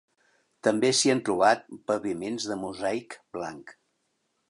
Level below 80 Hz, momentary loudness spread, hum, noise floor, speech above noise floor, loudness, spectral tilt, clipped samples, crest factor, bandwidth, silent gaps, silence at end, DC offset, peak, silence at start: -68 dBFS; 14 LU; none; -75 dBFS; 49 dB; -27 LUFS; -3 dB/octave; under 0.1%; 20 dB; 11.5 kHz; none; 0.75 s; under 0.1%; -8 dBFS; 0.65 s